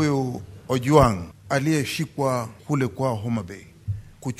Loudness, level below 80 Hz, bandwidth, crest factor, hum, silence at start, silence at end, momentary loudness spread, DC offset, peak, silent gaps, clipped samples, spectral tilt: -24 LUFS; -44 dBFS; 15.5 kHz; 22 dB; none; 0 s; 0.05 s; 16 LU; under 0.1%; -2 dBFS; none; under 0.1%; -6 dB/octave